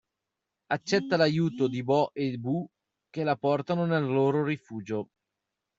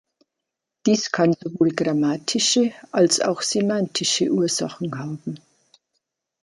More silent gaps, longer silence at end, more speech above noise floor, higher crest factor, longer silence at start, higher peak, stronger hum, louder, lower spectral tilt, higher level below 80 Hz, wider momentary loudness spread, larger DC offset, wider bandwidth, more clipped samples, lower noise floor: neither; second, 0.75 s vs 1.05 s; about the same, 59 dB vs 62 dB; about the same, 20 dB vs 18 dB; second, 0.7 s vs 0.85 s; second, -10 dBFS vs -6 dBFS; neither; second, -28 LUFS vs -21 LUFS; first, -5.5 dB/octave vs -4 dB/octave; about the same, -70 dBFS vs -68 dBFS; about the same, 10 LU vs 11 LU; neither; second, 7.8 kHz vs 11.5 kHz; neither; about the same, -86 dBFS vs -83 dBFS